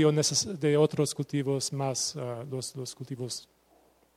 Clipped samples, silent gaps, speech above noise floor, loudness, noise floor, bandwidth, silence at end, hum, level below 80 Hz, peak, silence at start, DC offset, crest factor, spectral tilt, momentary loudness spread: under 0.1%; none; 35 dB; -30 LUFS; -64 dBFS; 15 kHz; 0.75 s; none; -70 dBFS; -12 dBFS; 0 s; under 0.1%; 18 dB; -4.5 dB/octave; 13 LU